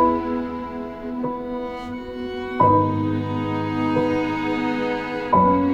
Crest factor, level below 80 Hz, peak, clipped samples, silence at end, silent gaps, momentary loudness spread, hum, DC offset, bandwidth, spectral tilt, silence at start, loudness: 16 dB; -46 dBFS; -6 dBFS; under 0.1%; 0 s; none; 13 LU; none; under 0.1%; 8 kHz; -8 dB/octave; 0 s; -23 LUFS